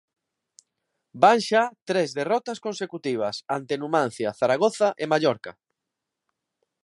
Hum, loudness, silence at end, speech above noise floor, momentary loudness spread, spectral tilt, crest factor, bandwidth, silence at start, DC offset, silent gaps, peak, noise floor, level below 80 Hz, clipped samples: none; -24 LUFS; 1.3 s; 61 dB; 12 LU; -4.5 dB/octave; 22 dB; 11.5 kHz; 1.15 s; under 0.1%; 1.82-1.86 s; -4 dBFS; -84 dBFS; -74 dBFS; under 0.1%